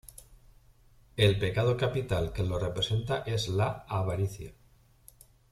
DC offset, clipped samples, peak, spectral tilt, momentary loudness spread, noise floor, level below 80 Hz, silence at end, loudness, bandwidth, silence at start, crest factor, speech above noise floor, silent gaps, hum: under 0.1%; under 0.1%; -12 dBFS; -6 dB/octave; 11 LU; -61 dBFS; -50 dBFS; 1 s; -30 LUFS; 14 kHz; 0.05 s; 20 dB; 32 dB; none; none